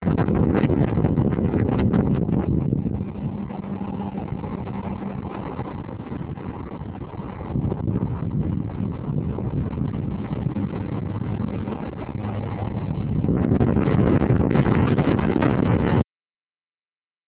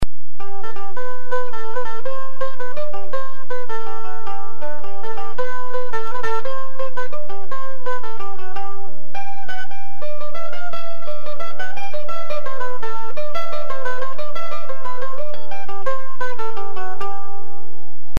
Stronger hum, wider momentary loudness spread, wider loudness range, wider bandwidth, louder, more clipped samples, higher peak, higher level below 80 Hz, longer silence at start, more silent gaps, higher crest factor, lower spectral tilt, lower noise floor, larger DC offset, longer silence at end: neither; first, 12 LU vs 6 LU; first, 10 LU vs 3 LU; second, 4 kHz vs 13.5 kHz; first, -24 LUFS vs -31 LUFS; neither; about the same, -4 dBFS vs -2 dBFS; first, -36 dBFS vs -46 dBFS; about the same, 0 s vs 0 s; neither; second, 18 dB vs 24 dB; first, -12.5 dB/octave vs -6 dB/octave; first, under -90 dBFS vs -49 dBFS; second, under 0.1% vs 50%; first, 1.25 s vs 0 s